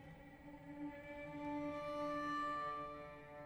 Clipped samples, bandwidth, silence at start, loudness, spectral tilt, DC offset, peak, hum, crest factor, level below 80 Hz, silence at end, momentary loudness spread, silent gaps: under 0.1%; over 20 kHz; 0 s; -45 LUFS; -6 dB/octave; under 0.1%; -34 dBFS; none; 14 dB; -68 dBFS; 0 s; 15 LU; none